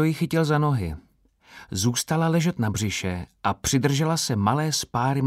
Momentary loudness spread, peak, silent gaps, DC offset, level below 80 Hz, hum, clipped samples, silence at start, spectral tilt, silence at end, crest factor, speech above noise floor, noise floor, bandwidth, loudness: 7 LU; -8 dBFS; none; under 0.1%; -48 dBFS; none; under 0.1%; 0 s; -5 dB/octave; 0 s; 16 dB; 31 dB; -55 dBFS; 16 kHz; -24 LUFS